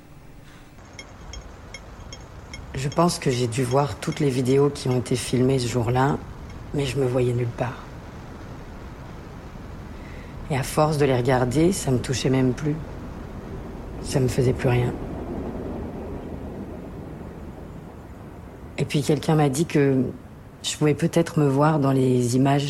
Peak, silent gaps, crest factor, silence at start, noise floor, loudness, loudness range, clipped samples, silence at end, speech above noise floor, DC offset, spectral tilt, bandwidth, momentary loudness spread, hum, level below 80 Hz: -8 dBFS; none; 16 dB; 0 s; -44 dBFS; -23 LUFS; 10 LU; under 0.1%; 0 s; 23 dB; under 0.1%; -6 dB/octave; 14 kHz; 20 LU; none; -42 dBFS